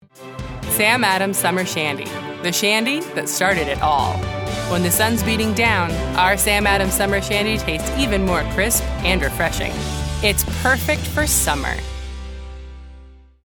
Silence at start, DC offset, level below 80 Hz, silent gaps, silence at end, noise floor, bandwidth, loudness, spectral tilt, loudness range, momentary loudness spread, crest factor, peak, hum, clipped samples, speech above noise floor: 0.15 s; under 0.1%; -30 dBFS; none; 0.3 s; -43 dBFS; over 20 kHz; -18 LUFS; -3.5 dB/octave; 2 LU; 13 LU; 20 dB; 0 dBFS; none; under 0.1%; 24 dB